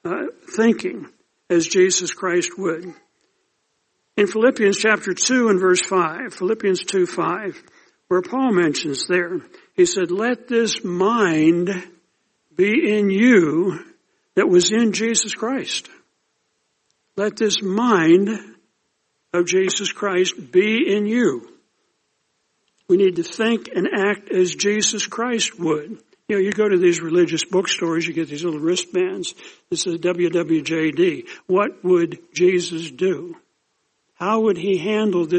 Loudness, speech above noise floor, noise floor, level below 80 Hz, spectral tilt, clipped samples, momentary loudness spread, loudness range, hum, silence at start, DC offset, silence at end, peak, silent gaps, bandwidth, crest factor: -19 LUFS; 52 dB; -71 dBFS; -68 dBFS; -4 dB/octave; under 0.1%; 10 LU; 4 LU; none; 0.05 s; under 0.1%; 0 s; -4 dBFS; none; 8.8 kHz; 16 dB